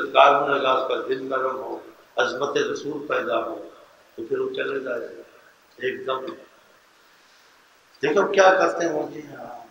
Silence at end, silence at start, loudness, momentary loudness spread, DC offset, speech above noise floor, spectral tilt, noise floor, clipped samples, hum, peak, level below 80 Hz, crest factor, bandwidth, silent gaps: 0.05 s; 0 s; -23 LUFS; 21 LU; under 0.1%; 33 dB; -3.5 dB/octave; -56 dBFS; under 0.1%; none; 0 dBFS; -74 dBFS; 24 dB; 16 kHz; none